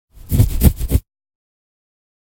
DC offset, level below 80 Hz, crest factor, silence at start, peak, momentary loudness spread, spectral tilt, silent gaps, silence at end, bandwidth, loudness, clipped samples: under 0.1%; -22 dBFS; 18 dB; 0.3 s; 0 dBFS; 7 LU; -6.5 dB/octave; none; 1.35 s; 17 kHz; -18 LUFS; under 0.1%